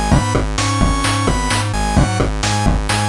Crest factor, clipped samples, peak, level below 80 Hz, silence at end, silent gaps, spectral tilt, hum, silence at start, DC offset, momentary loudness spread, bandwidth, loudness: 14 dB; under 0.1%; -2 dBFS; -22 dBFS; 0 s; none; -4.5 dB/octave; none; 0 s; under 0.1%; 2 LU; 11.5 kHz; -16 LUFS